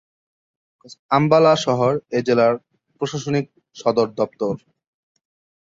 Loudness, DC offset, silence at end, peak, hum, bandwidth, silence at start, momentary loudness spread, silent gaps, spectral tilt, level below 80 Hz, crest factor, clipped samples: -19 LUFS; under 0.1%; 1.05 s; -2 dBFS; none; 7.8 kHz; 0.9 s; 13 LU; 0.99-1.09 s; -6 dB/octave; -62 dBFS; 18 dB; under 0.1%